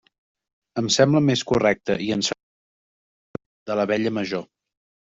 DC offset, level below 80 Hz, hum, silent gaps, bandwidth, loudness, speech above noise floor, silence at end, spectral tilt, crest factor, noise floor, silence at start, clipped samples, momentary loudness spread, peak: under 0.1%; -56 dBFS; none; 2.43-3.34 s, 3.46-3.66 s; 8 kHz; -22 LUFS; over 69 dB; 0.75 s; -4.5 dB/octave; 20 dB; under -90 dBFS; 0.75 s; under 0.1%; 19 LU; -4 dBFS